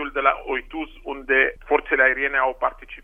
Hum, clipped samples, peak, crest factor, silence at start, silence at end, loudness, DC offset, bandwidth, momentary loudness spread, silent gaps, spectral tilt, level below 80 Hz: none; under 0.1%; -2 dBFS; 20 dB; 0 s; 0.05 s; -21 LUFS; under 0.1%; 3.7 kHz; 15 LU; none; -5.5 dB/octave; -44 dBFS